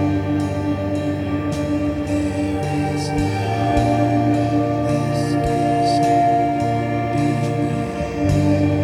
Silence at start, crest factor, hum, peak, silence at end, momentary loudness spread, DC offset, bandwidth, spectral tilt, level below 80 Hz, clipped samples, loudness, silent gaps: 0 s; 14 dB; none; -4 dBFS; 0 s; 5 LU; under 0.1%; 13 kHz; -7 dB/octave; -36 dBFS; under 0.1%; -19 LUFS; none